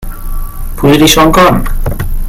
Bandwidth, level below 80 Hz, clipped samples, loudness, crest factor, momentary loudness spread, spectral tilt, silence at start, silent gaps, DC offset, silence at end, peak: 17 kHz; -16 dBFS; 1%; -8 LUFS; 8 dB; 19 LU; -4.5 dB/octave; 0 s; none; under 0.1%; 0 s; 0 dBFS